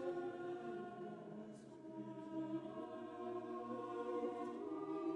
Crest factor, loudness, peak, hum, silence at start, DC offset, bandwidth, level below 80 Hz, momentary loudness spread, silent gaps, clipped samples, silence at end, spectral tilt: 14 dB; -48 LUFS; -32 dBFS; none; 0 s; under 0.1%; 10.5 kHz; -86 dBFS; 9 LU; none; under 0.1%; 0 s; -7.5 dB/octave